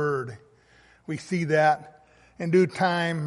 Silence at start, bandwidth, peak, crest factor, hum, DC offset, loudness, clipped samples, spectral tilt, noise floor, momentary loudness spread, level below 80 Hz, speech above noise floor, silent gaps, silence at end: 0 s; 11.5 kHz; -8 dBFS; 18 dB; none; under 0.1%; -25 LUFS; under 0.1%; -6.5 dB/octave; -58 dBFS; 15 LU; -66 dBFS; 34 dB; none; 0 s